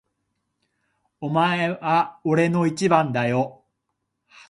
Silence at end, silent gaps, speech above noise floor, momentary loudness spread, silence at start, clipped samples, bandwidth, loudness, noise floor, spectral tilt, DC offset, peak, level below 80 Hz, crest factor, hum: 0.95 s; none; 57 dB; 6 LU; 1.2 s; under 0.1%; 11.5 kHz; -22 LUFS; -78 dBFS; -6.5 dB/octave; under 0.1%; -2 dBFS; -66 dBFS; 22 dB; none